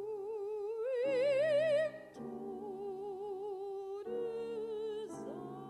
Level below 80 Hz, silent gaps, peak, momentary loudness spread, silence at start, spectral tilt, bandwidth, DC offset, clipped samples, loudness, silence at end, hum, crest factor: -78 dBFS; none; -24 dBFS; 13 LU; 0 s; -5.5 dB/octave; 11.5 kHz; under 0.1%; under 0.1%; -38 LUFS; 0 s; none; 14 dB